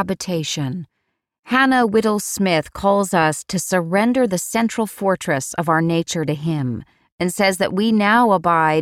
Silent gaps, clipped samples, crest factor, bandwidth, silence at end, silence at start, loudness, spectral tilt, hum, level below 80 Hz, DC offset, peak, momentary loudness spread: 1.39-1.43 s, 7.12-7.18 s; under 0.1%; 14 dB; 16.5 kHz; 0 s; 0 s; -18 LUFS; -4.5 dB/octave; none; -52 dBFS; under 0.1%; -4 dBFS; 9 LU